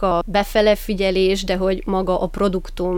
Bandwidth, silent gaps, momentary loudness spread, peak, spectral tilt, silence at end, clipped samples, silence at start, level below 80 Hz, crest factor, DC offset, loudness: 18.5 kHz; none; 5 LU; -4 dBFS; -5.5 dB/octave; 0 s; under 0.1%; 0 s; -32 dBFS; 14 dB; under 0.1%; -19 LUFS